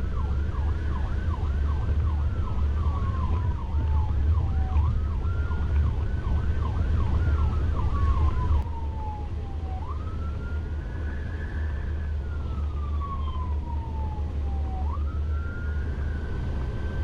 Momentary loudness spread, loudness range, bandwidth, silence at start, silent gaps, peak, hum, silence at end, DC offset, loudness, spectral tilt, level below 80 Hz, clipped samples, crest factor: 7 LU; 5 LU; 4.9 kHz; 0 s; none; -12 dBFS; none; 0 s; under 0.1%; -29 LUFS; -8.5 dB/octave; -28 dBFS; under 0.1%; 12 dB